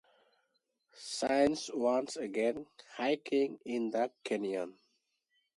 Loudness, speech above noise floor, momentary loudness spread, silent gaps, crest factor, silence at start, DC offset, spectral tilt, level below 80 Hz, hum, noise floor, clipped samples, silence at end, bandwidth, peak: -34 LUFS; 46 dB; 12 LU; none; 20 dB; 0.95 s; under 0.1%; -4 dB/octave; -72 dBFS; none; -80 dBFS; under 0.1%; 0.85 s; 11.5 kHz; -16 dBFS